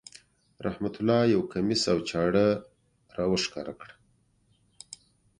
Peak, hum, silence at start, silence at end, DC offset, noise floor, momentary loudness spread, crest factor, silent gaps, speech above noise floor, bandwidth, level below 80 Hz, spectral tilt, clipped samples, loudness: -10 dBFS; none; 0.6 s; 1.55 s; under 0.1%; -67 dBFS; 22 LU; 20 dB; none; 41 dB; 11 kHz; -58 dBFS; -5 dB/octave; under 0.1%; -27 LUFS